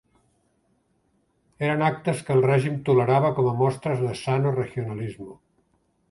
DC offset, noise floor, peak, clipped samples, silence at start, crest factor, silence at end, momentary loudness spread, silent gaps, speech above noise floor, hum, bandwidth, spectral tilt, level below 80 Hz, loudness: under 0.1%; -68 dBFS; -8 dBFS; under 0.1%; 1.6 s; 18 dB; 0.75 s; 12 LU; none; 45 dB; none; 11.5 kHz; -7.5 dB/octave; -60 dBFS; -23 LUFS